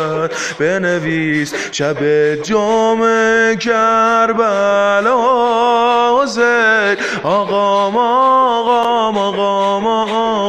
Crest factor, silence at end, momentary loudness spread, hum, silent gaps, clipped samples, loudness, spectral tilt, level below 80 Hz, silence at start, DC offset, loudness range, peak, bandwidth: 12 dB; 0 s; 5 LU; none; none; under 0.1%; -13 LUFS; -4 dB/octave; -52 dBFS; 0 s; under 0.1%; 2 LU; -2 dBFS; 10 kHz